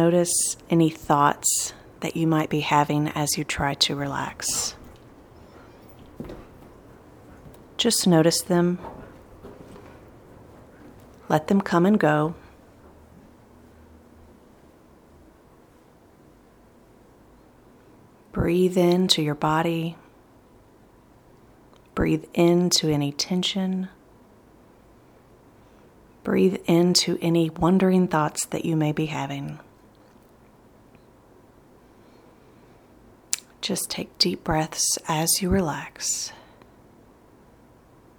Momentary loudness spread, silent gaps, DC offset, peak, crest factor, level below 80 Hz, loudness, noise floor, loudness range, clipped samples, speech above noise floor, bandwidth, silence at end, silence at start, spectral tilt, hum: 15 LU; none; under 0.1%; -2 dBFS; 24 dB; -50 dBFS; -23 LUFS; -54 dBFS; 9 LU; under 0.1%; 32 dB; over 20 kHz; 1.85 s; 0 s; -4 dB/octave; none